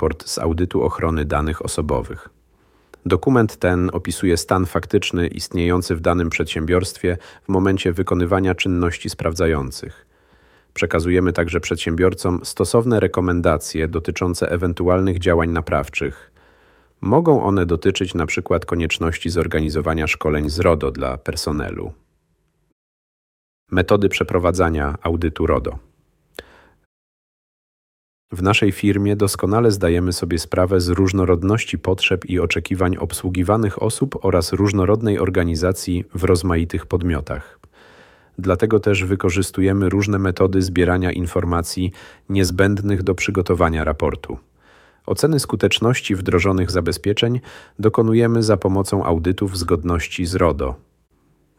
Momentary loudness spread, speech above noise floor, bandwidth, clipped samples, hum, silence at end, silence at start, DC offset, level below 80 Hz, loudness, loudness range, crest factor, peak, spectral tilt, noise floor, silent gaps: 7 LU; 47 dB; 16 kHz; under 0.1%; none; 0.85 s; 0 s; under 0.1%; -34 dBFS; -19 LUFS; 4 LU; 18 dB; -2 dBFS; -6 dB/octave; -65 dBFS; 22.72-23.67 s, 26.86-28.28 s